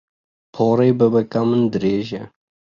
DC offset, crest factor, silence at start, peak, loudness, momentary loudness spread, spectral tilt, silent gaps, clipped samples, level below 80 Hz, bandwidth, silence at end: under 0.1%; 16 dB; 0.55 s; -4 dBFS; -18 LUFS; 10 LU; -8.5 dB/octave; none; under 0.1%; -56 dBFS; 7 kHz; 0.5 s